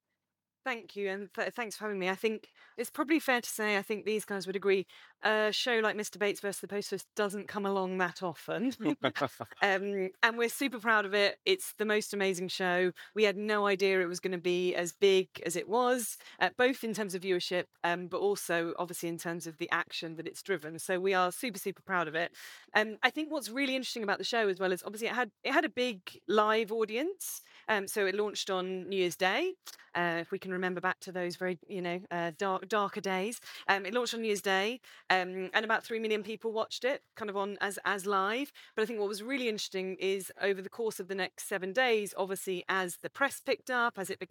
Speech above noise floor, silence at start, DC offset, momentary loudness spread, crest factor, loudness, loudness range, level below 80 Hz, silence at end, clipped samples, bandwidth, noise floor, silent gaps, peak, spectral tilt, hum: 57 dB; 0.65 s; under 0.1%; 9 LU; 24 dB; -32 LUFS; 4 LU; under -90 dBFS; 0.05 s; under 0.1%; 19 kHz; -90 dBFS; none; -8 dBFS; -3.5 dB/octave; none